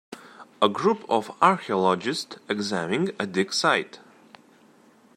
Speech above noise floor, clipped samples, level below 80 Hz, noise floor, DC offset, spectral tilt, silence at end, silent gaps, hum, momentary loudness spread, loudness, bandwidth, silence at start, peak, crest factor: 32 dB; under 0.1%; -74 dBFS; -56 dBFS; under 0.1%; -4.5 dB/octave; 1.2 s; none; none; 10 LU; -24 LUFS; 15.5 kHz; 0.1 s; -4 dBFS; 22 dB